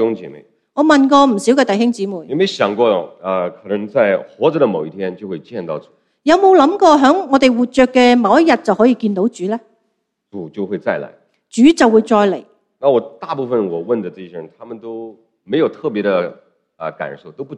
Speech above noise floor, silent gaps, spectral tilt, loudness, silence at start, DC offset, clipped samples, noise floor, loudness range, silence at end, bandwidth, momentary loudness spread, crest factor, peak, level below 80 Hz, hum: 55 dB; none; -5.5 dB/octave; -14 LUFS; 0 s; under 0.1%; under 0.1%; -69 dBFS; 9 LU; 0 s; 11 kHz; 18 LU; 16 dB; 0 dBFS; -56 dBFS; none